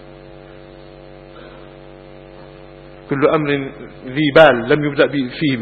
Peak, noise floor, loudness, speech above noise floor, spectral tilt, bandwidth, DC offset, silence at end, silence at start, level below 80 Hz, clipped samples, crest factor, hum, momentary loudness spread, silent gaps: 0 dBFS; -39 dBFS; -15 LUFS; 24 dB; -8 dB/octave; 6.8 kHz; under 0.1%; 0 s; 0 s; -48 dBFS; under 0.1%; 18 dB; none; 28 LU; none